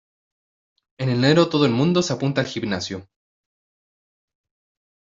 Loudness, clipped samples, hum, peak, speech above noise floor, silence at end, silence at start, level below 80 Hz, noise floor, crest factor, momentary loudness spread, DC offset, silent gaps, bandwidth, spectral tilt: -20 LUFS; under 0.1%; none; -4 dBFS; over 70 dB; 2.15 s; 1 s; -60 dBFS; under -90 dBFS; 20 dB; 11 LU; under 0.1%; none; 7.8 kHz; -6 dB/octave